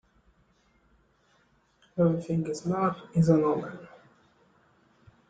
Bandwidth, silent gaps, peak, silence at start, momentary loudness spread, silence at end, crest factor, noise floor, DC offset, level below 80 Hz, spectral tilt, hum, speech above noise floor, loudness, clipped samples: 9 kHz; none; -8 dBFS; 1.95 s; 16 LU; 1.45 s; 22 dB; -67 dBFS; under 0.1%; -64 dBFS; -8.5 dB/octave; none; 40 dB; -27 LUFS; under 0.1%